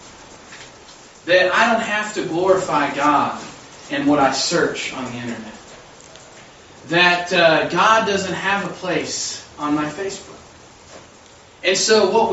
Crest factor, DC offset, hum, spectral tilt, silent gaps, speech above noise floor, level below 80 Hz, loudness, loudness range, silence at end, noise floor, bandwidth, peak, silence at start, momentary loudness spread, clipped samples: 18 dB; under 0.1%; none; -3 dB/octave; none; 27 dB; -56 dBFS; -18 LUFS; 6 LU; 0 s; -46 dBFS; 8.2 kHz; -2 dBFS; 0 s; 19 LU; under 0.1%